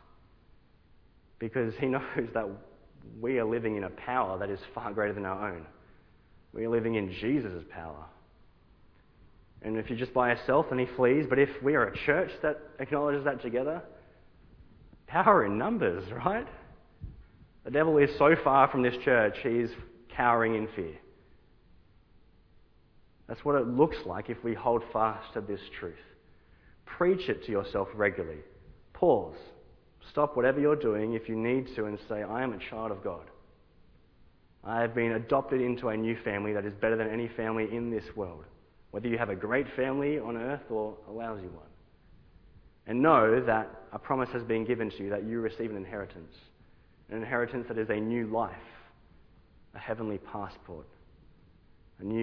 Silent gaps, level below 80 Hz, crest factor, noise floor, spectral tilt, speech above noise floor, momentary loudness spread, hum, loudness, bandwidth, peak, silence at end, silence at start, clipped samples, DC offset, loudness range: none; -58 dBFS; 24 dB; -61 dBFS; -5.5 dB/octave; 31 dB; 17 LU; none; -30 LUFS; 5.4 kHz; -6 dBFS; 0 s; 1.4 s; under 0.1%; under 0.1%; 8 LU